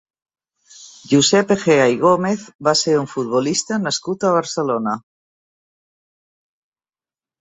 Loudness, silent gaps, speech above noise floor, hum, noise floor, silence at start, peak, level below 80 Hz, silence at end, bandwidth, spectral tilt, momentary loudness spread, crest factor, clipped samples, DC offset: -17 LUFS; 2.55-2.59 s; over 73 dB; none; under -90 dBFS; 0.8 s; -2 dBFS; -60 dBFS; 2.4 s; 8.4 kHz; -4 dB/octave; 8 LU; 18 dB; under 0.1%; under 0.1%